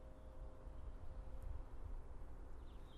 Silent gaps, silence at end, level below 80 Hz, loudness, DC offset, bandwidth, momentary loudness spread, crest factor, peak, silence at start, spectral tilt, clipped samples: none; 0 s; -52 dBFS; -57 LUFS; under 0.1%; 10.5 kHz; 4 LU; 12 dB; -38 dBFS; 0 s; -7.5 dB/octave; under 0.1%